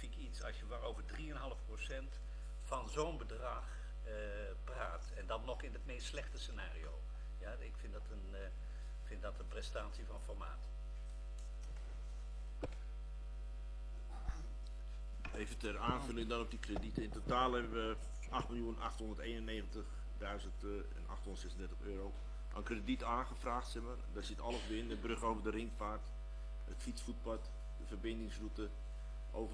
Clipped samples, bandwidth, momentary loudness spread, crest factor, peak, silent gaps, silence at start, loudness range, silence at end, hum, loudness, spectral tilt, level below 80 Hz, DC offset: under 0.1%; 11 kHz; 9 LU; 22 dB; -22 dBFS; none; 0 s; 8 LU; 0 s; none; -46 LUFS; -5.5 dB/octave; -46 dBFS; under 0.1%